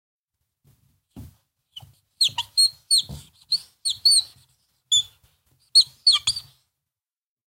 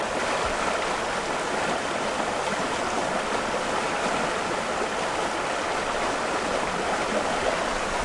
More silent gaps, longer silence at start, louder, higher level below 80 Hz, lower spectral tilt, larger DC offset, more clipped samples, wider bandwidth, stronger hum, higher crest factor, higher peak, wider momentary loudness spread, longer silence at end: neither; first, 1.15 s vs 0 s; first, -19 LUFS vs -26 LUFS; second, -58 dBFS vs -48 dBFS; second, 2 dB/octave vs -3 dB/octave; neither; neither; first, 16 kHz vs 11.5 kHz; neither; first, 20 dB vs 14 dB; first, -6 dBFS vs -12 dBFS; first, 12 LU vs 2 LU; first, 1.1 s vs 0 s